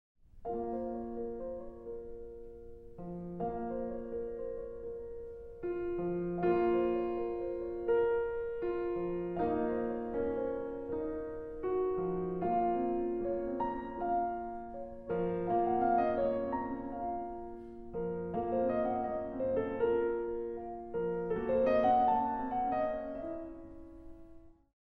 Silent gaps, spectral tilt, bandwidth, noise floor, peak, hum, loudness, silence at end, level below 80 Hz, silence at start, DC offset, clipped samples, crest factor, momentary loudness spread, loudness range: none; -10 dB/octave; 4.8 kHz; -55 dBFS; -18 dBFS; none; -35 LUFS; 0.35 s; -56 dBFS; 0.35 s; under 0.1%; under 0.1%; 16 dB; 15 LU; 9 LU